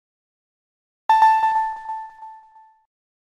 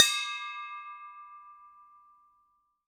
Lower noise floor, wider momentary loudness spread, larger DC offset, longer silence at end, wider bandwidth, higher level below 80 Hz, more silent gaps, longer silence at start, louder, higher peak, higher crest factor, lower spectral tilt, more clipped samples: second, -50 dBFS vs -72 dBFS; second, 18 LU vs 23 LU; neither; second, 0.9 s vs 1.2 s; second, 11 kHz vs 18 kHz; first, -62 dBFS vs -86 dBFS; neither; first, 1.1 s vs 0 s; first, -19 LUFS vs -31 LUFS; about the same, -6 dBFS vs -4 dBFS; second, 18 dB vs 32 dB; first, -0.5 dB/octave vs 5 dB/octave; neither